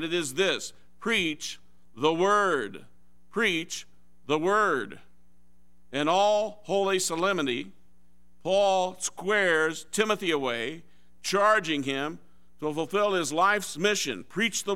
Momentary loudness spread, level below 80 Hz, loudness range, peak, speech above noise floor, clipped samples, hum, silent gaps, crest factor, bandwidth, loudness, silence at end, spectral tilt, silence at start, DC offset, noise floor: 13 LU; -66 dBFS; 2 LU; -8 dBFS; 38 dB; under 0.1%; none; none; 18 dB; 16 kHz; -26 LUFS; 0 s; -3 dB/octave; 0 s; 0.5%; -65 dBFS